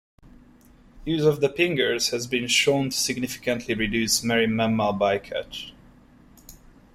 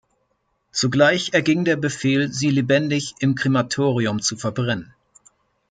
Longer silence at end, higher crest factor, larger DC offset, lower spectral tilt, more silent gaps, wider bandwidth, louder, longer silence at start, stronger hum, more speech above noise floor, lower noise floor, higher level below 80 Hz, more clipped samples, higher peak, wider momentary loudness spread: second, 0.4 s vs 0.85 s; about the same, 20 dB vs 18 dB; neither; second, -3.5 dB/octave vs -5 dB/octave; neither; first, 16 kHz vs 9.4 kHz; second, -23 LUFS vs -20 LUFS; first, 0.95 s vs 0.75 s; neither; second, 29 dB vs 50 dB; second, -53 dBFS vs -69 dBFS; first, -50 dBFS vs -58 dBFS; neither; about the same, -6 dBFS vs -4 dBFS; first, 12 LU vs 7 LU